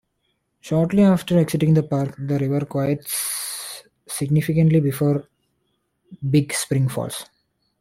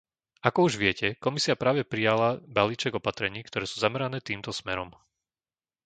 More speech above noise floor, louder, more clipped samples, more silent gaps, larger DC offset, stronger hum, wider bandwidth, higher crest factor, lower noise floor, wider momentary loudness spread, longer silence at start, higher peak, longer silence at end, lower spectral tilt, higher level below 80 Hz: second, 52 dB vs over 63 dB; first, -21 LUFS vs -27 LUFS; neither; neither; neither; neither; first, 16.5 kHz vs 9.4 kHz; second, 16 dB vs 26 dB; second, -71 dBFS vs under -90 dBFS; first, 13 LU vs 9 LU; first, 0.65 s vs 0.45 s; second, -6 dBFS vs -2 dBFS; second, 0.55 s vs 0.95 s; first, -6 dB/octave vs -4.5 dB/octave; about the same, -54 dBFS vs -58 dBFS